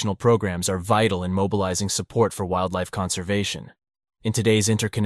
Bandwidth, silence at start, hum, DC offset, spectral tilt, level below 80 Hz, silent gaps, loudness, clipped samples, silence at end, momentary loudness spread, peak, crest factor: 13 kHz; 0 s; none; under 0.1%; -4.5 dB/octave; -50 dBFS; none; -23 LUFS; under 0.1%; 0 s; 6 LU; -6 dBFS; 18 dB